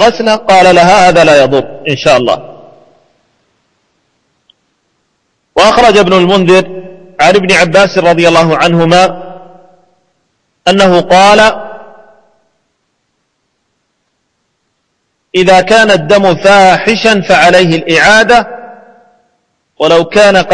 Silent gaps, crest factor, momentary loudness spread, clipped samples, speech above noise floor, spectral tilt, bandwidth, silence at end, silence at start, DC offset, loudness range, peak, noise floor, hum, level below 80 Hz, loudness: none; 8 dB; 10 LU; 2%; 57 dB; -4.5 dB/octave; 11 kHz; 0 s; 0 s; under 0.1%; 9 LU; 0 dBFS; -63 dBFS; none; -38 dBFS; -6 LUFS